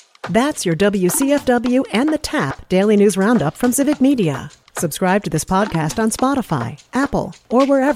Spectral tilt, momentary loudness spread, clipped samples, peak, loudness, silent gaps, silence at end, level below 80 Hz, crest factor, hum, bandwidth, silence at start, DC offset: -5 dB/octave; 8 LU; under 0.1%; -4 dBFS; -17 LUFS; none; 0 s; -44 dBFS; 14 dB; none; 16 kHz; 0.25 s; under 0.1%